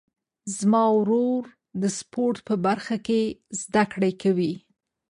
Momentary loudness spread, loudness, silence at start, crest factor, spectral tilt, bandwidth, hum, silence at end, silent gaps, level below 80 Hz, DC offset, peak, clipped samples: 11 LU; -24 LUFS; 0.45 s; 16 dB; -5.5 dB/octave; 11 kHz; none; 0.55 s; none; -64 dBFS; under 0.1%; -8 dBFS; under 0.1%